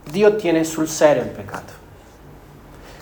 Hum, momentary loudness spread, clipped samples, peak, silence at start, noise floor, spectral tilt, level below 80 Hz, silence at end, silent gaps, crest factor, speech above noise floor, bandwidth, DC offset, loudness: none; 18 LU; under 0.1%; -2 dBFS; 0.05 s; -43 dBFS; -4.5 dB/octave; -48 dBFS; 0 s; none; 20 dB; 25 dB; over 20 kHz; under 0.1%; -18 LUFS